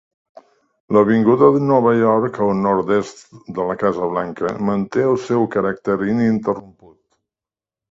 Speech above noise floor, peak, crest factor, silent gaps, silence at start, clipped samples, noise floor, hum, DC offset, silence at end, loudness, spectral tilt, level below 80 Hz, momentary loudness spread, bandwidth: over 73 dB; 0 dBFS; 18 dB; none; 0.9 s; under 0.1%; under -90 dBFS; none; under 0.1%; 1.3 s; -17 LUFS; -8 dB/octave; -56 dBFS; 10 LU; 7.8 kHz